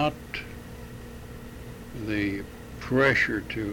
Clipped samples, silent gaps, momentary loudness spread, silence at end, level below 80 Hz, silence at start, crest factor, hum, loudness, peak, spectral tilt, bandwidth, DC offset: under 0.1%; none; 21 LU; 0 s; -46 dBFS; 0 s; 20 dB; none; -26 LUFS; -10 dBFS; -6 dB/octave; over 20 kHz; under 0.1%